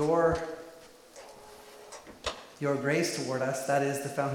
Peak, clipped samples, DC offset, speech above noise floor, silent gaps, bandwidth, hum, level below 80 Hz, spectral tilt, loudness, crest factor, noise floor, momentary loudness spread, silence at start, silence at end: -14 dBFS; under 0.1%; under 0.1%; 23 dB; none; 17.5 kHz; none; -56 dBFS; -5 dB/octave; -30 LUFS; 18 dB; -52 dBFS; 22 LU; 0 s; 0 s